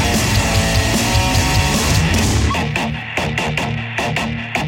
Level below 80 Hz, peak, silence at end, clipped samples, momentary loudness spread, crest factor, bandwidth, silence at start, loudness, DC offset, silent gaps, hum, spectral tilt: -24 dBFS; -2 dBFS; 0 s; under 0.1%; 6 LU; 14 dB; 17 kHz; 0 s; -16 LUFS; under 0.1%; none; none; -4 dB/octave